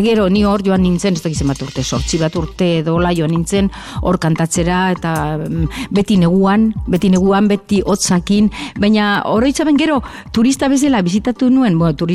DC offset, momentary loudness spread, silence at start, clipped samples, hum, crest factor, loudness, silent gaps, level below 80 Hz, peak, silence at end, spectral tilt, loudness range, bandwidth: under 0.1%; 7 LU; 0 s; under 0.1%; none; 10 dB; -15 LUFS; none; -32 dBFS; -4 dBFS; 0 s; -5.5 dB/octave; 3 LU; 14.5 kHz